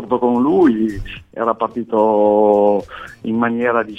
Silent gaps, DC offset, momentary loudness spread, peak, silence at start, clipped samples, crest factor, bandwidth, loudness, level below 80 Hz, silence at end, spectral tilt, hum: none; under 0.1%; 13 LU; -2 dBFS; 0 s; under 0.1%; 14 dB; 8 kHz; -16 LUFS; -42 dBFS; 0 s; -8 dB/octave; none